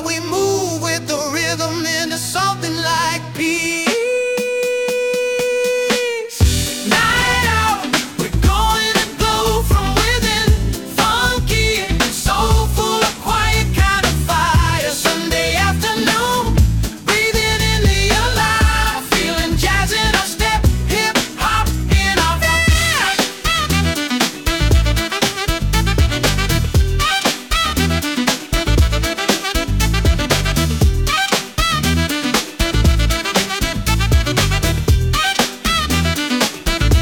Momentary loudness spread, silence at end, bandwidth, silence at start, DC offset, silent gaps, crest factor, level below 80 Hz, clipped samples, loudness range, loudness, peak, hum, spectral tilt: 4 LU; 0 s; 19 kHz; 0 s; under 0.1%; none; 16 dB; -22 dBFS; under 0.1%; 2 LU; -16 LUFS; 0 dBFS; none; -4 dB/octave